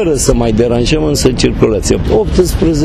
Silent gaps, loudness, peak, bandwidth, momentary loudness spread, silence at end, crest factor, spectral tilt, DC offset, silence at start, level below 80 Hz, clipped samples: none; -11 LUFS; 0 dBFS; 14.5 kHz; 1 LU; 0 s; 10 dB; -5.5 dB/octave; under 0.1%; 0 s; -20 dBFS; 0.1%